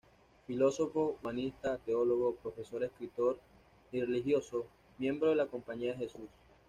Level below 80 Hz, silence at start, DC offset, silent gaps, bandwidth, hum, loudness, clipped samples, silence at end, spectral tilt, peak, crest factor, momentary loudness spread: -66 dBFS; 0.5 s; under 0.1%; none; 9.8 kHz; none; -35 LUFS; under 0.1%; 0.4 s; -6 dB/octave; -18 dBFS; 16 dB; 12 LU